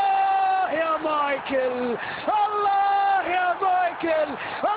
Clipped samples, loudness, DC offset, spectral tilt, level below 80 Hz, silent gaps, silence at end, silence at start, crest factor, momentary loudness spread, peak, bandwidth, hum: under 0.1%; -23 LUFS; under 0.1%; -7.5 dB/octave; -62 dBFS; none; 0 s; 0 s; 10 dB; 6 LU; -12 dBFS; 4 kHz; none